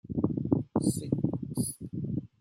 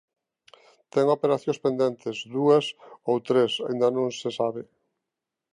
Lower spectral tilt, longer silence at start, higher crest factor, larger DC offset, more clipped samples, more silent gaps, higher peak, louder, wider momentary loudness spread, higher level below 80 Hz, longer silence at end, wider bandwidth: first, -7.5 dB/octave vs -5.5 dB/octave; second, 0.05 s vs 0.95 s; about the same, 20 dB vs 18 dB; neither; neither; neither; about the same, -10 dBFS vs -8 dBFS; second, -32 LUFS vs -25 LUFS; second, 6 LU vs 10 LU; first, -58 dBFS vs -76 dBFS; second, 0.15 s vs 0.9 s; first, 16.5 kHz vs 10.5 kHz